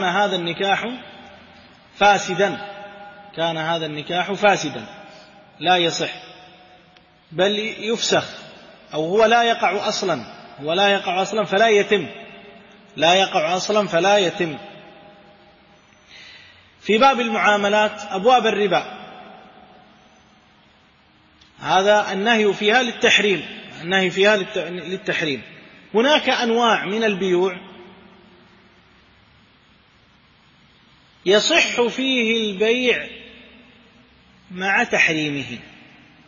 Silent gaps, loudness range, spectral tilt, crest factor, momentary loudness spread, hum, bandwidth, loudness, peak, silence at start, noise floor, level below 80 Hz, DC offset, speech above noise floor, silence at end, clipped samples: none; 5 LU; -3.5 dB/octave; 18 dB; 19 LU; none; 7.4 kHz; -19 LUFS; -2 dBFS; 0 s; -54 dBFS; -62 dBFS; under 0.1%; 36 dB; 0.6 s; under 0.1%